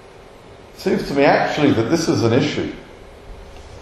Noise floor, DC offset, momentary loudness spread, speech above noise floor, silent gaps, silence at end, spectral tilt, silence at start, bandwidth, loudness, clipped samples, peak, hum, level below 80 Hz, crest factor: -42 dBFS; under 0.1%; 23 LU; 25 dB; none; 0 s; -5.5 dB/octave; 0.05 s; 13.5 kHz; -18 LUFS; under 0.1%; -2 dBFS; none; -44 dBFS; 18 dB